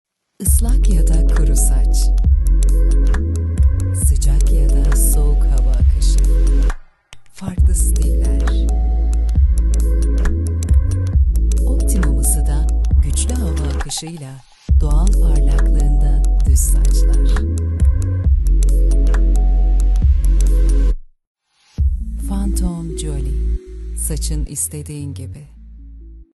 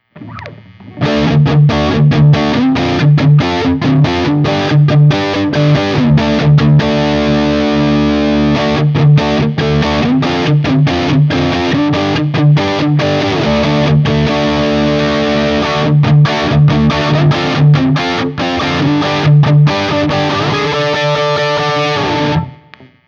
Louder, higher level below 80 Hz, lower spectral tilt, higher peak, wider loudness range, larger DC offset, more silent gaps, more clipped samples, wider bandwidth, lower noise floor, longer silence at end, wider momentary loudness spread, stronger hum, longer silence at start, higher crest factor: second, -17 LUFS vs -11 LUFS; first, -14 dBFS vs -32 dBFS; second, -5.5 dB/octave vs -7 dB/octave; about the same, -2 dBFS vs 0 dBFS; first, 6 LU vs 1 LU; neither; first, 21.27-21.35 s vs none; neither; first, 12.5 kHz vs 7 kHz; about the same, -41 dBFS vs -40 dBFS; second, 0.1 s vs 0.5 s; first, 8 LU vs 4 LU; neither; first, 0.4 s vs 0.15 s; about the same, 12 dB vs 10 dB